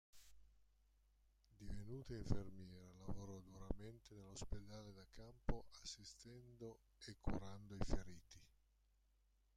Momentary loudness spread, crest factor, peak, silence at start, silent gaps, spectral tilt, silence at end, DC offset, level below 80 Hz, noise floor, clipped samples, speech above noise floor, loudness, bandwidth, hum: 13 LU; 26 dB; -24 dBFS; 0.15 s; none; -5.5 dB/octave; 1.1 s; under 0.1%; -56 dBFS; -79 dBFS; under 0.1%; 31 dB; -54 LUFS; 11 kHz; none